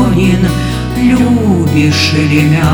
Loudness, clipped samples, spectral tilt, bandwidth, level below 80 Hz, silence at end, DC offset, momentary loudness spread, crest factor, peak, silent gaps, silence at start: -10 LUFS; under 0.1%; -6 dB/octave; over 20 kHz; -26 dBFS; 0 s; under 0.1%; 4 LU; 10 dB; 0 dBFS; none; 0 s